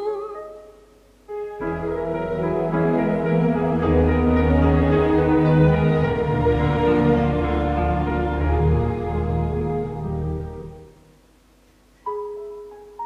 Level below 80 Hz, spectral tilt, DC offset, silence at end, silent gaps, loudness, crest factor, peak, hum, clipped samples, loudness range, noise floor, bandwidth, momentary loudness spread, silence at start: -30 dBFS; -9.5 dB/octave; under 0.1%; 0 s; none; -21 LUFS; 16 dB; -6 dBFS; none; under 0.1%; 10 LU; -55 dBFS; 5.8 kHz; 16 LU; 0 s